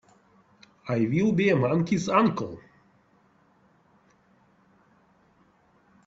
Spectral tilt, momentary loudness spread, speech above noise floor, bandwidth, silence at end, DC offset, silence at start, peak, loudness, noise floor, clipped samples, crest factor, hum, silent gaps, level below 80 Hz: -7 dB/octave; 16 LU; 39 dB; 7.8 kHz; 3.5 s; under 0.1%; 0.85 s; -8 dBFS; -24 LUFS; -63 dBFS; under 0.1%; 22 dB; none; none; -64 dBFS